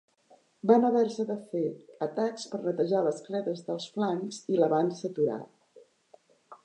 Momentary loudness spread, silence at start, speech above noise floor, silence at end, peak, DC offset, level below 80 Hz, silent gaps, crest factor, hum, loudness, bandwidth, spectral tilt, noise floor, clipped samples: 11 LU; 0.65 s; 34 dB; 0.1 s; -8 dBFS; under 0.1%; -86 dBFS; none; 22 dB; none; -29 LUFS; 9.2 kHz; -6.5 dB/octave; -63 dBFS; under 0.1%